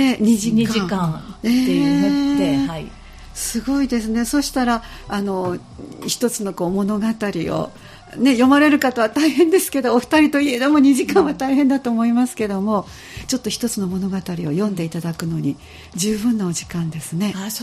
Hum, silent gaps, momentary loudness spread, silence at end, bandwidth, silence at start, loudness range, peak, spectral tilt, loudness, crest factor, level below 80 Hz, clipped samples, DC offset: none; none; 11 LU; 0 s; 15.5 kHz; 0 s; 7 LU; -2 dBFS; -5 dB/octave; -19 LUFS; 16 dB; -44 dBFS; under 0.1%; under 0.1%